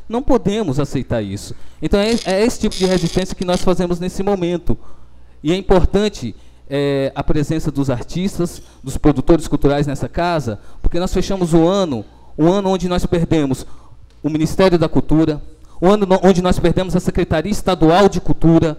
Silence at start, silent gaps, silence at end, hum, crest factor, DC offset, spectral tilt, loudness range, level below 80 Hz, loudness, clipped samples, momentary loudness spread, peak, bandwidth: 0 s; none; 0 s; none; 16 dB; under 0.1%; -6.5 dB/octave; 4 LU; -26 dBFS; -17 LUFS; under 0.1%; 12 LU; 0 dBFS; 14.5 kHz